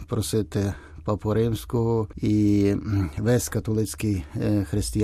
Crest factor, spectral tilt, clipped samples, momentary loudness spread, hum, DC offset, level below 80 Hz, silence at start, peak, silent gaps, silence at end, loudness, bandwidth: 14 dB; -6.5 dB/octave; under 0.1%; 6 LU; none; under 0.1%; -42 dBFS; 0 s; -10 dBFS; none; 0 s; -25 LUFS; 14.5 kHz